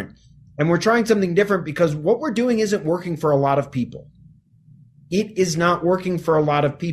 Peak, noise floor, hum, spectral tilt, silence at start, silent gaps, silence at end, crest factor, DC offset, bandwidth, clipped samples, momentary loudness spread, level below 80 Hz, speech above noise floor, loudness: -4 dBFS; -51 dBFS; none; -6 dB/octave; 0 s; none; 0 s; 16 dB; under 0.1%; 14 kHz; under 0.1%; 7 LU; -54 dBFS; 31 dB; -20 LUFS